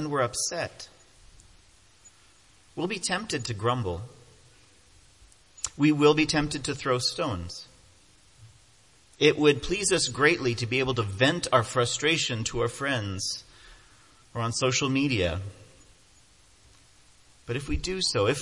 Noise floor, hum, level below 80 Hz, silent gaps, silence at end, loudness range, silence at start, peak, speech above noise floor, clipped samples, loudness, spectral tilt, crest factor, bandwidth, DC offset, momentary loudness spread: -59 dBFS; none; -50 dBFS; none; 0 s; 8 LU; 0 s; -6 dBFS; 33 dB; under 0.1%; -26 LUFS; -4 dB/octave; 24 dB; 11.5 kHz; under 0.1%; 14 LU